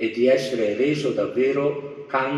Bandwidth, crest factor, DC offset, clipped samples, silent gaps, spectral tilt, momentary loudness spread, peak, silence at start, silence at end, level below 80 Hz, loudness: 12 kHz; 14 dB; under 0.1%; under 0.1%; none; -6 dB/octave; 7 LU; -8 dBFS; 0 s; 0 s; -68 dBFS; -22 LUFS